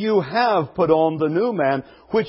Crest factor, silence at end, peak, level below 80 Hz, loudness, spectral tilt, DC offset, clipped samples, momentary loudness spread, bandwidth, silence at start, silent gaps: 16 dB; 0 s; -4 dBFS; -56 dBFS; -20 LUFS; -11 dB/octave; under 0.1%; under 0.1%; 5 LU; 5.8 kHz; 0 s; none